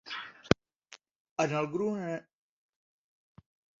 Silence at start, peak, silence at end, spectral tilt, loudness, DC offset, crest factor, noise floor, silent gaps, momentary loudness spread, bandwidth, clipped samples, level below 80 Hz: 0.05 s; -2 dBFS; 1.6 s; -4.5 dB/octave; -33 LUFS; under 0.1%; 34 dB; -58 dBFS; 1.20-1.25 s, 1.31-1.36 s; 24 LU; 7.4 kHz; under 0.1%; -58 dBFS